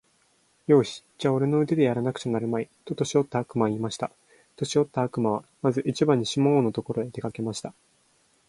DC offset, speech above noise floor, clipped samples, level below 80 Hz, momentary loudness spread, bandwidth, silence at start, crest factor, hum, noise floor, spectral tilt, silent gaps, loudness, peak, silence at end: under 0.1%; 40 dB; under 0.1%; -64 dBFS; 11 LU; 11.5 kHz; 0.7 s; 20 dB; none; -65 dBFS; -6.5 dB/octave; none; -26 LUFS; -6 dBFS; 0.75 s